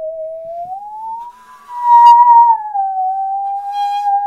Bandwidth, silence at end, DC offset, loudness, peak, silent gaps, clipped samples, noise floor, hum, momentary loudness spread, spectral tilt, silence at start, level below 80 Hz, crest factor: 7 kHz; 0 s; under 0.1%; -11 LUFS; 0 dBFS; none; 0.2%; -35 dBFS; none; 21 LU; -1 dB/octave; 0 s; -62 dBFS; 12 dB